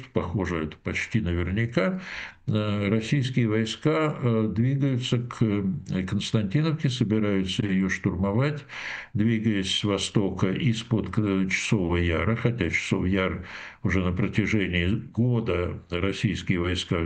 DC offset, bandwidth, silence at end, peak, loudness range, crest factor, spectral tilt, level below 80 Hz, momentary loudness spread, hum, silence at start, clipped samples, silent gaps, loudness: under 0.1%; 9.4 kHz; 0 s; -8 dBFS; 1 LU; 18 dB; -6 dB/octave; -46 dBFS; 5 LU; none; 0 s; under 0.1%; none; -26 LUFS